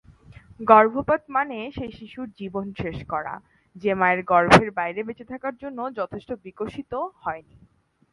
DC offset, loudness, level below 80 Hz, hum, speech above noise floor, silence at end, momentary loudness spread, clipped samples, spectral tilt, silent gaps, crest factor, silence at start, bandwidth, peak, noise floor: under 0.1%; -23 LUFS; -50 dBFS; none; 25 dB; 0.7 s; 19 LU; under 0.1%; -6 dB/octave; none; 24 dB; 0.6 s; 11.5 kHz; 0 dBFS; -49 dBFS